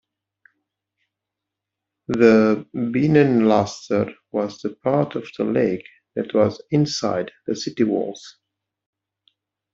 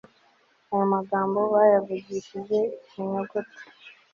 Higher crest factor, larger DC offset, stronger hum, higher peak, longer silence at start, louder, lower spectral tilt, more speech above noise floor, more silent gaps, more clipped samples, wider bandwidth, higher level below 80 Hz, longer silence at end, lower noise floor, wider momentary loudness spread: about the same, 20 dB vs 20 dB; neither; neither; first, -2 dBFS vs -6 dBFS; first, 2.1 s vs 0.7 s; first, -20 LUFS vs -25 LUFS; about the same, -6.5 dB/octave vs -7.5 dB/octave; first, 64 dB vs 38 dB; neither; neither; about the same, 7.6 kHz vs 7.2 kHz; first, -60 dBFS vs -72 dBFS; first, 1.45 s vs 0.25 s; first, -84 dBFS vs -63 dBFS; about the same, 13 LU vs 15 LU